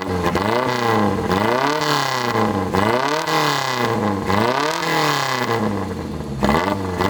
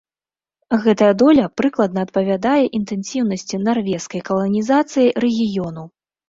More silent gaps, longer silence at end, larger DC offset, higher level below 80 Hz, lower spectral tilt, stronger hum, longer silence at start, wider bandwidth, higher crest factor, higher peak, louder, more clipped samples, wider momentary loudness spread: neither; second, 0 s vs 0.4 s; neither; first, -44 dBFS vs -56 dBFS; second, -4.5 dB/octave vs -6 dB/octave; neither; second, 0 s vs 0.7 s; first, over 20 kHz vs 7.8 kHz; about the same, 16 dB vs 16 dB; about the same, -2 dBFS vs -2 dBFS; about the same, -19 LUFS vs -18 LUFS; neither; second, 4 LU vs 10 LU